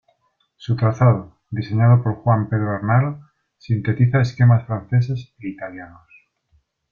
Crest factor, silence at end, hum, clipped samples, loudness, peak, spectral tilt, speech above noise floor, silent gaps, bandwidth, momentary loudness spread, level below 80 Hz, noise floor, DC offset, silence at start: 16 dB; 1.05 s; none; under 0.1%; -19 LUFS; -4 dBFS; -9 dB/octave; 48 dB; none; 6.4 kHz; 17 LU; -52 dBFS; -66 dBFS; under 0.1%; 0.6 s